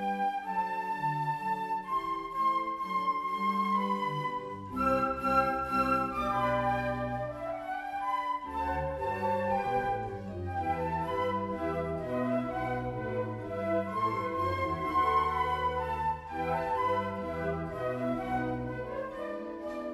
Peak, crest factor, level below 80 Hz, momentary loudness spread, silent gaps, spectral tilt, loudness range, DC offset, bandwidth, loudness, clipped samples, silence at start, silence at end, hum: -14 dBFS; 18 dB; -52 dBFS; 8 LU; none; -7 dB/octave; 3 LU; under 0.1%; 15 kHz; -32 LUFS; under 0.1%; 0 s; 0 s; none